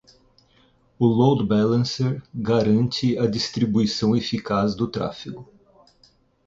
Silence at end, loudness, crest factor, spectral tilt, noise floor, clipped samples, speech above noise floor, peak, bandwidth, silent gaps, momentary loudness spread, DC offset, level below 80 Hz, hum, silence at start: 1.05 s; -22 LUFS; 18 dB; -7 dB/octave; -59 dBFS; under 0.1%; 38 dB; -4 dBFS; 7.8 kHz; none; 10 LU; under 0.1%; -52 dBFS; none; 1 s